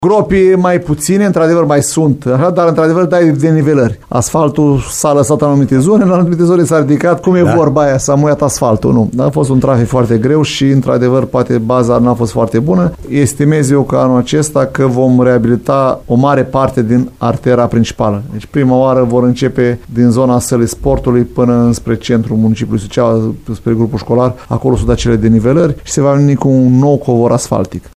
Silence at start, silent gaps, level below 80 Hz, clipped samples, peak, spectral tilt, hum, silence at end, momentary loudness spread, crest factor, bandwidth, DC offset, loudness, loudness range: 0 s; none; -32 dBFS; under 0.1%; 0 dBFS; -6.5 dB/octave; none; 0.05 s; 4 LU; 10 dB; 15.5 kHz; under 0.1%; -11 LUFS; 2 LU